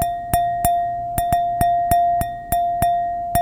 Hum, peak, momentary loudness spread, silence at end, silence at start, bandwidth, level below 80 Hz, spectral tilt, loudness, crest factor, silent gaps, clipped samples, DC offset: none; -2 dBFS; 5 LU; 0 s; 0 s; 17 kHz; -36 dBFS; -5 dB/octave; -20 LUFS; 18 dB; none; under 0.1%; under 0.1%